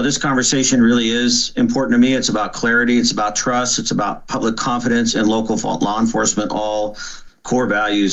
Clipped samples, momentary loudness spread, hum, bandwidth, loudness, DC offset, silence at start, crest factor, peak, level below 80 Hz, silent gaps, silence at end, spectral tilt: under 0.1%; 7 LU; none; 8.4 kHz; -17 LUFS; under 0.1%; 0 s; 12 dB; -4 dBFS; -42 dBFS; none; 0 s; -3 dB/octave